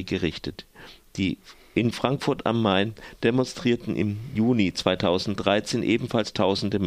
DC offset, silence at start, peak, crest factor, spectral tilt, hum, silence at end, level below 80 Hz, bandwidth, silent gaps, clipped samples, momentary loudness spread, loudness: under 0.1%; 0 s; -4 dBFS; 22 dB; -6 dB/octave; none; 0 s; -52 dBFS; 15 kHz; none; under 0.1%; 7 LU; -25 LUFS